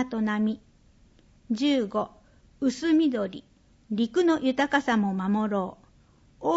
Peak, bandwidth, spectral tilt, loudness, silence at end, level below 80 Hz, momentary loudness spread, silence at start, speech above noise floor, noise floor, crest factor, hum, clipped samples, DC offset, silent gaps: -10 dBFS; 8 kHz; -6 dB/octave; -26 LUFS; 0 s; -60 dBFS; 11 LU; 0 s; 33 dB; -58 dBFS; 18 dB; none; under 0.1%; under 0.1%; none